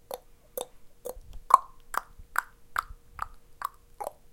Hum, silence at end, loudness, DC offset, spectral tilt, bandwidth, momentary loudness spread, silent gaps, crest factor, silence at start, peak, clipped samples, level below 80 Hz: none; 0.2 s; -32 LUFS; under 0.1%; -2 dB/octave; 17 kHz; 20 LU; none; 32 dB; 0.1 s; 0 dBFS; under 0.1%; -52 dBFS